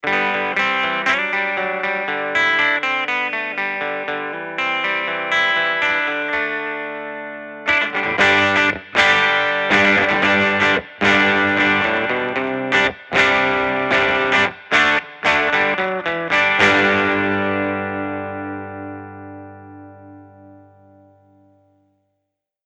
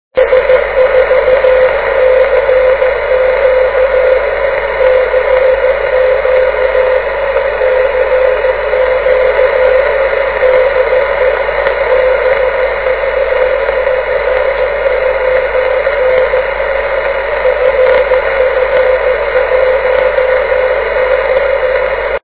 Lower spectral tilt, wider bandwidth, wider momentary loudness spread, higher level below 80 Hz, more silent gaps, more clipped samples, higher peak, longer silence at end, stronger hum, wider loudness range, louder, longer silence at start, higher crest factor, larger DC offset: second, -4 dB/octave vs -7 dB/octave; first, 9.8 kHz vs 4 kHz; first, 12 LU vs 4 LU; second, -54 dBFS vs -32 dBFS; neither; second, under 0.1% vs 0.1%; about the same, 0 dBFS vs 0 dBFS; first, 2.1 s vs 0.05 s; first, 50 Hz at -50 dBFS vs none; first, 6 LU vs 2 LU; second, -17 LUFS vs -10 LUFS; about the same, 0.05 s vs 0.15 s; first, 18 dB vs 10 dB; second, under 0.1% vs 0.7%